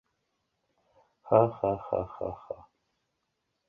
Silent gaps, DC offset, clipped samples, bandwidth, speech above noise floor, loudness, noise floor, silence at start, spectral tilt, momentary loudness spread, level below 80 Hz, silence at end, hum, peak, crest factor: none; under 0.1%; under 0.1%; 3.7 kHz; 53 dB; -29 LUFS; -80 dBFS; 1.25 s; -11 dB/octave; 19 LU; -60 dBFS; 1.15 s; none; -8 dBFS; 24 dB